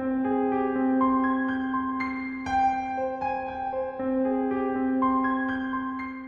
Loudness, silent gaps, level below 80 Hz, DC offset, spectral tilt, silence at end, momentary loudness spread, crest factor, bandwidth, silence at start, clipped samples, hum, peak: -27 LUFS; none; -54 dBFS; under 0.1%; -7 dB/octave; 0 s; 7 LU; 12 dB; 6 kHz; 0 s; under 0.1%; none; -14 dBFS